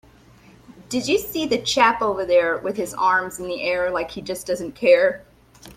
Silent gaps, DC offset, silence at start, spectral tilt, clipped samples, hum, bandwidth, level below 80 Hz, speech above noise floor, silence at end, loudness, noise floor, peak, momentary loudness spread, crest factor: none; under 0.1%; 0.7 s; -3 dB/octave; under 0.1%; none; 16 kHz; -54 dBFS; 29 dB; 0.05 s; -21 LUFS; -50 dBFS; -2 dBFS; 11 LU; 20 dB